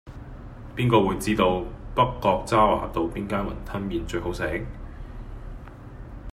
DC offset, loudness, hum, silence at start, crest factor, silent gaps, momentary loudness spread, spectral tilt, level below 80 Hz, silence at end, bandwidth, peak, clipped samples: under 0.1%; -24 LUFS; none; 0.05 s; 22 dB; none; 21 LU; -6 dB/octave; -38 dBFS; 0 s; 16 kHz; -4 dBFS; under 0.1%